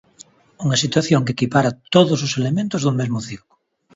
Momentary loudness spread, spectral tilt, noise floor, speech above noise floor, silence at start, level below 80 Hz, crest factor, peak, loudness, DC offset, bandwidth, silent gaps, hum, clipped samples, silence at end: 10 LU; -5 dB/octave; -48 dBFS; 30 dB; 0.6 s; -54 dBFS; 18 dB; -2 dBFS; -19 LUFS; under 0.1%; 8 kHz; none; none; under 0.1%; 0.6 s